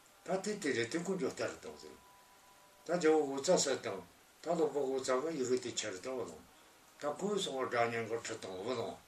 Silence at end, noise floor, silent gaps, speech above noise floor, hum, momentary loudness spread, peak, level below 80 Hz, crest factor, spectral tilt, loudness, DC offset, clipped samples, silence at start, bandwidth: 0.05 s; -62 dBFS; none; 26 dB; none; 16 LU; -18 dBFS; -78 dBFS; 20 dB; -3.5 dB/octave; -36 LUFS; under 0.1%; under 0.1%; 0.25 s; 15 kHz